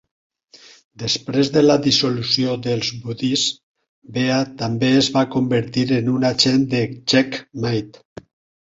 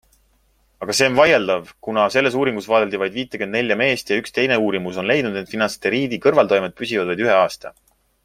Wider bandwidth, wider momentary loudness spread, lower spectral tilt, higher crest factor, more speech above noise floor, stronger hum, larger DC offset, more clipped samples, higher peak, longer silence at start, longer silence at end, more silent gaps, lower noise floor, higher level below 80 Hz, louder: second, 7.8 kHz vs 16 kHz; about the same, 9 LU vs 9 LU; about the same, -5 dB/octave vs -4 dB/octave; about the same, 18 dB vs 18 dB; second, 29 dB vs 42 dB; neither; neither; neither; about the same, -2 dBFS vs -2 dBFS; first, 1 s vs 0.8 s; first, 0.75 s vs 0.55 s; first, 3.63-3.75 s, 3.89-4.02 s vs none; second, -48 dBFS vs -60 dBFS; about the same, -54 dBFS vs -58 dBFS; about the same, -19 LUFS vs -19 LUFS